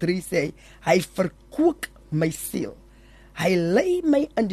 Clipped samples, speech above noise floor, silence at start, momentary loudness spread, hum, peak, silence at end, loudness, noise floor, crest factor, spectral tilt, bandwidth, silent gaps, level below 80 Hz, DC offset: under 0.1%; 27 dB; 0 s; 10 LU; none; -6 dBFS; 0 s; -24 LUFS; -50 dBFS; 18 dB; -6 dB/octave; 13 kHz; none; -52 dBFS; under 0.1%